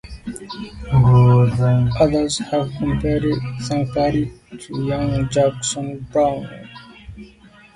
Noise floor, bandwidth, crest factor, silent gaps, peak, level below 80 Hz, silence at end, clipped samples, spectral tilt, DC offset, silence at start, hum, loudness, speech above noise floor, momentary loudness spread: -47 dBFS; 11.5 kHz; 16 dB; none; -2 dBFS; -36 dBFS; 0.5 s; under 0.1%; -6.5 dB/octave; under 0.1%; 0.05 s; none; -18 LUFS; 28 dB; 21 LU